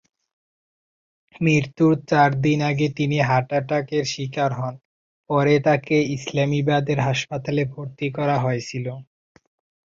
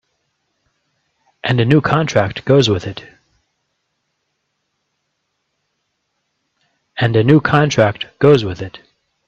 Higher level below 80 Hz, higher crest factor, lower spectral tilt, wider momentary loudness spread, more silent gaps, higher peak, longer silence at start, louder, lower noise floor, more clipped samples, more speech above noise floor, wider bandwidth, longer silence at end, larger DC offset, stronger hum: second, -58 dBFS vs -50 dBFS; about the same, 18 dB vs 18 dB; about the same, -6.5 dB/octave vs -6.5 dB/octave; second, 10 LU vs 17 LU; first, 4.85-5.24 s vs none; second, -4 dBFS vs 0 dBFS; about the same, 1.4 s vs 1.45 s; second, -21 LUFS vs -14 LUFS; first, under -90 dBFS vs -71 dBFS; neither; first, over 69 dB vs 57 dB; about the same, 7.6 kHz vs 7.8 kHz; first, 0.85 s vs 0.5 s; neither; neither